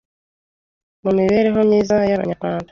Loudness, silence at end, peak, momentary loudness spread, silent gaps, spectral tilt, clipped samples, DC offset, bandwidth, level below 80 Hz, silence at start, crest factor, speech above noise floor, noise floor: -17 LUFS; 0.05 s; -4 dBFS; 8 LU; none; -7.5 dB/octave; under 0.1%; under 0.1%; 7.2 kHz; -50 dBFS; 1.05 s; 14 dB; over 74 dB; under -90 dBFS